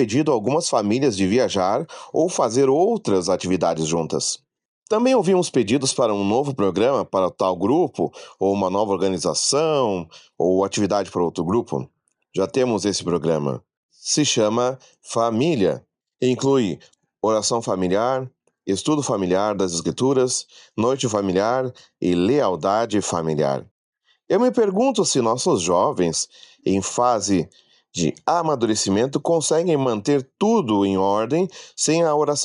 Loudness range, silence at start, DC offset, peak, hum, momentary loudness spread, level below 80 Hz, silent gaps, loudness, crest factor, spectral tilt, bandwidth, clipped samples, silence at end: 2 LU; 0 s; under 0.1%; -6 dBFS; none; 7 LU; -64 dBFS; 4.65-4.82 s, 13.77-13.89 s, 23.71-23.93 s; -21 LUFS; 16 dB; -4.5 dB/octave; 11.5 kHz; under 0.1%; 0 s